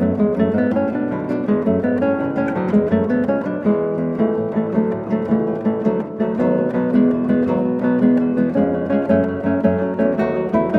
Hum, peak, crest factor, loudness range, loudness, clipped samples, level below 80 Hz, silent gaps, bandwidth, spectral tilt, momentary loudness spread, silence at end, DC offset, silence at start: none; -2 dBFS; 16 dB; 2 LU; -18 LUFS; under 0.1%; -50 dBFS; none; 4.7 kHz; -10.5 dB/octave; 4 LU; 0 s; under 0.1%; 0 s